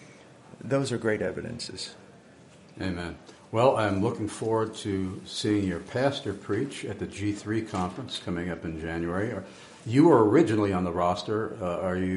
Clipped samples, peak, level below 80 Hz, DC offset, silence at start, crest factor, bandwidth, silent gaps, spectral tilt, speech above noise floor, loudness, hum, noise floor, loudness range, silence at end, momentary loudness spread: under 0.1%; -6 dBFS; -56 dBFS; under 0.1%; 0 s; 20 dB; 11.5 kHz; none; -6 dB/octave; 26 dB; -28 LUFS; none; -53 dBFS; 7 LU; 0 s; 14 LU